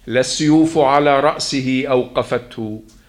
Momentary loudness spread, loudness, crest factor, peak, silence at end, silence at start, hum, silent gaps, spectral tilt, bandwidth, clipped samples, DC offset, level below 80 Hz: 12 LU; -16 LUFS; 16 dB; 0 dBFS; 0.25 s; 0.05 s; none; none; -5 dB/octave; 12 kHz; under 0.1%; under 0.1%; -48 dBFS